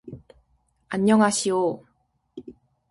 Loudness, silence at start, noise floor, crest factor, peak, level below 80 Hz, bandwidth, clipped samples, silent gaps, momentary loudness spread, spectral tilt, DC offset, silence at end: -22 LUFS; 0.05 s; -69 dBFS; 20 dB; -6 dBFS; -62 dBFS; 11.5 kHz; under 0.1%; none; 25 LU; -4.5 dB/octave; under 0.1%; 0.4 s